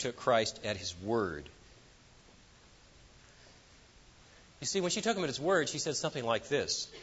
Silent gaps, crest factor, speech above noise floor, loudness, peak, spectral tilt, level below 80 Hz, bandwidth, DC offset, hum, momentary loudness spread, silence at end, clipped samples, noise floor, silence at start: none; 20 dB; 26 dB; -33 LUFS; -14 dBFS; -3 dB/octave; -64 dBFS; 8 kHz; under 0.1%; none; 8 LU; 0 s; under 0.1%; -60 dBFS; 0 s